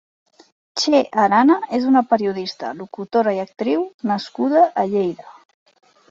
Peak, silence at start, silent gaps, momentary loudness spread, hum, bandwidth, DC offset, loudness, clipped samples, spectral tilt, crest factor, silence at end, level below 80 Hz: -4 dBFS; 0.75 s; 3.94-3.99 s; 13 LU; none; 7.8 kHz; under 0.1%; -19 LUFS; under 0.1%; -5 dB/octave; 16 dB; 0.8 s; -66 dBFS